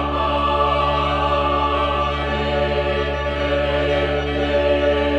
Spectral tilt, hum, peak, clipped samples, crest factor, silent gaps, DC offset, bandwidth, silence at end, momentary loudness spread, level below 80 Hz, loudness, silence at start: -6.5 dB/octave; none; -8 dBFS; under 0.1%; 12 dB; none; under 0.1%; 8.4 kHz; 0 s; 3 LU; -28 dBFS; -19 LUFS; 0 s